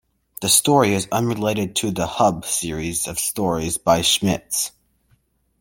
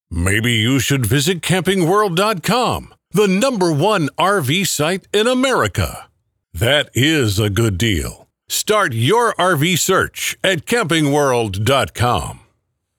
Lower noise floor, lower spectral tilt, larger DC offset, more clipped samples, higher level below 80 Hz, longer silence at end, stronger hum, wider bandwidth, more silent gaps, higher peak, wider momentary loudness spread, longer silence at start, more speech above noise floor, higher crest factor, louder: second, -63 dBFS vs -67 dBFS; about the same, -3.5 dB/octave vs -4.5 dB/octave; neither; neither; second, -48 dBFS vs -40 dBFS; first, 0.9 s vs 0.6 s; neither; second, 17 kHz vs 19 kHz; neither; about the same, -2 dBFS vs 0 dBFS; about the same, 8 LU vs 6 LU; first, 0.4 s vs 0.1 s; second, 43 dB vs 51 dB; about the same, 20 dB vs 16 dB; second, -19 LUFS vs -16 LUFS